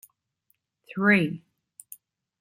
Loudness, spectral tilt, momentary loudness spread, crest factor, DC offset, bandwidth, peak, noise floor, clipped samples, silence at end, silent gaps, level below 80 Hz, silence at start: -23 LUFS; -6.5 dB/octave; 26 LU; 22 dB; under 0.1%; 16 kHz; -8 dBFS; -73 dBFS; under 0.1%; 1.05 s; none; -72 dBFS; 0.95 s